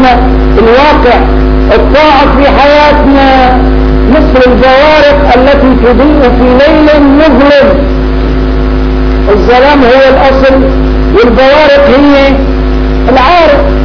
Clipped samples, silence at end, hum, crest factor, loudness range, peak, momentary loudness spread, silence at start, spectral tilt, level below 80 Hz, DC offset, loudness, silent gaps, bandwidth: 9%; 0 s; none; 4 dB; 2 LU; 0 dBFS; 7 LU; 0 s; -7.5 dB/octave; -10 dBFS; 2%; -4 LUFS; none; 5.4 kHz